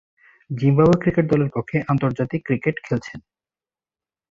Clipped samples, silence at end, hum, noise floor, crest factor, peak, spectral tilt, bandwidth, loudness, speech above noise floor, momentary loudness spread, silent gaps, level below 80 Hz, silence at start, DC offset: under 0.1%; 1.1 s; none; under -90 dBFS; 18 dB; -4 dBFS; -9 dB/octave; 7.4 kHz; -20 LUFS; over 70 dB; 11 LU; none; -50 dBFS; 0.5 s; under 0.1%